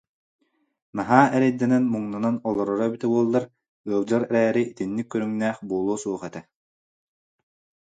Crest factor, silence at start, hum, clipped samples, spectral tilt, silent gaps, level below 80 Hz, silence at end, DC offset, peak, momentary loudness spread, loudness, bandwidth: 24 dB; 0.95 s; none; under 0.1%; -7 dB/octave; 3.68-3.84 s; -66 dBFS; 1.45 s; under 0.1%; 0 dBFS; 13 LU; -23 LUFS; 9.2 kHz